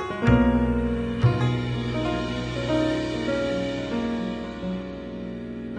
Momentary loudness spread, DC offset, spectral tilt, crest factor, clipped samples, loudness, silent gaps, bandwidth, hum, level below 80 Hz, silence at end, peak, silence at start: 13 LU; under 0.1%; -7.5 dB/octave; 18 dB; under 0.1%; -25 LUFS; none; 9.6 kHz; none; -36 dBFS; 0 s; -8 dBFS; 0 s